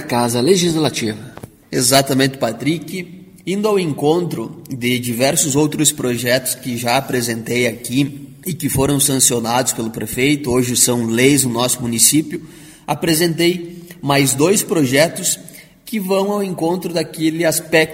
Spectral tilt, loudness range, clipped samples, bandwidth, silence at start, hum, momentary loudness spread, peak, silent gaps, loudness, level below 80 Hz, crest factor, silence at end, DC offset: -3.5 dB/octave; 3 LU; under 0.1%; 16.5 kHz; 0 s; none; 12 LU; 0 dBFS; none; -16 LUFS; -48 dBFS; 16 dB; 0 s; under 0.1%